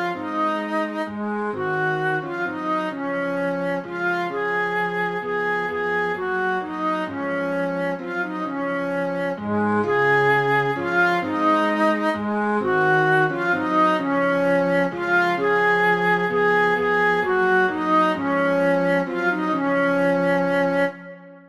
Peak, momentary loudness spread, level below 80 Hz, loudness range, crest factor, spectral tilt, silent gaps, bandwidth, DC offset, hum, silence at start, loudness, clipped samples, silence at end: -8 dBFS; 7 LU; -66 dBFS; 5 LU; 14 dB; -6.5 dB/octave; none; 13 kHz; under 0.1%; none; 0 s; -21 LUFS; under 0.1%; 0.1 s